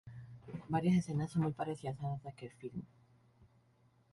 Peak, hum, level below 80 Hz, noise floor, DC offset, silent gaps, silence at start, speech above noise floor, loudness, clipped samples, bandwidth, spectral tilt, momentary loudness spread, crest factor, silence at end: -20 dBFS; none; -66 dBFS; -70 dBFS; under 0.1%; none; 0.05 s; 34 dB; -37 LUFS; under 0.1%; 11.5 kHz; -8 dB/octave; 18 LU; 18 dB; 0.7 s